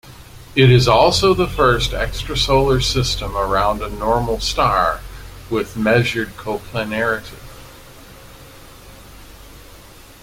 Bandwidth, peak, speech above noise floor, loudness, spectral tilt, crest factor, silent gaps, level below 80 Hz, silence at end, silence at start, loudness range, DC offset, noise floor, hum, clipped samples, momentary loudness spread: 16.5 kHz; 0 dBFS; 25 dB; -17 LUFS; -5 dB/octave; 18 dB; none; -32 dBFS; 0.4 s; 0.05 s; 12 LU; under 0.1%; -41 dBFS; none; under 0.1%; 13 LU